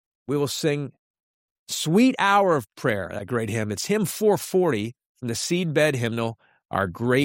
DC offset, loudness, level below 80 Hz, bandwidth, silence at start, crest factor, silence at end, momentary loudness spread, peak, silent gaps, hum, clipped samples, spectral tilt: under 0.1%; -24 LUFS; -62 dBFS; 16.5 kHz; 0.3 s; 16 dB; 0 s; 11 LU; -6 dBFS; 0.99-1.14 s, 1.20-1.66 s, 5.06-5.15 s; none; under 0.1%; -5 dB/octave